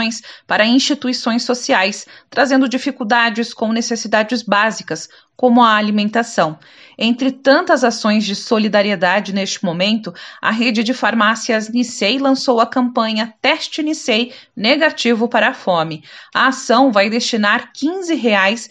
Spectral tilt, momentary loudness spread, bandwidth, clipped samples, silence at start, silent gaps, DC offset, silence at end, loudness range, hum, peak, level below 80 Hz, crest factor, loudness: -3.5 dB/octave; 8 LU; 10 kHz; under 0.1%; 0 s; none; under 0.1%; 0.05 s; 1 LU; none; 0 dBFS; -70 dBFS; 16 dB; -15 LUFS